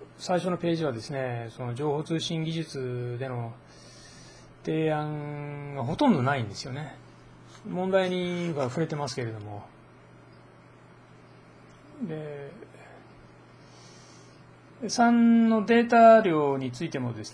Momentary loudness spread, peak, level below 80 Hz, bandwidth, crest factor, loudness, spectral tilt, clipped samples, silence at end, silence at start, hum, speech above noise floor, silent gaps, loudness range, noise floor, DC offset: 20 LU; -8 dBFS; -64 dBFS; 10.5 kHz; 20 dB; -26 LUFS; -6 dB/octave; under 0.1%; 0 s; 0 s; none; 27 dB; none; 21 LU; -53 dBFS; under 0.1%